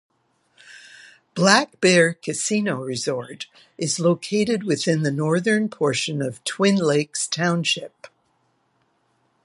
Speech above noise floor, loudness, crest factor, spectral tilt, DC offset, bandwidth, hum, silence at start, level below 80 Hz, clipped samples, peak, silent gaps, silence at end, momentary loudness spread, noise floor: 46 dB; -21 LUFS; 22 dB; -4 dB/octave; under 0.1%; 11.5 kHz; none; 0.7 s; -68 dBFS; under 0.1%; 0 dBFS; none; 1.4 s; 13 LU; -67 dBFS